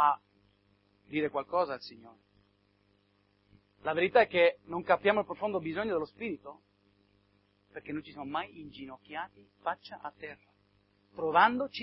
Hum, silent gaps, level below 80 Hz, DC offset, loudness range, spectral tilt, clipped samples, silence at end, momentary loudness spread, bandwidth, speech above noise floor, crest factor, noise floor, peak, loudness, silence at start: 50 Hz at -60 dBFS; none; -72 dBFS; under 0.1%; 12 LU; -8 dB/octave; under 0.1%; 0 s; 21 LU; 5.8 kHz; 39 dB; 24 dB; -71 dBFS; -10 dBFS; -31 LUFS; 0 s